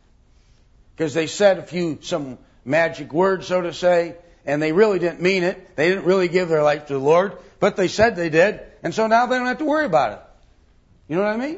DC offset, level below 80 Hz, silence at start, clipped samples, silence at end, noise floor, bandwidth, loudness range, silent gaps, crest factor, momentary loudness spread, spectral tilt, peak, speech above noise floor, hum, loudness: under 0.1%; -52 dBFS; 1 s; under 0.1%; 0 s; -54 dBFS; 8 kHz; 3 LU; none; 18 dB; 10 LU; -5.5 dB/octave; -2 dBFS; 35 dB; none; -20 LUFS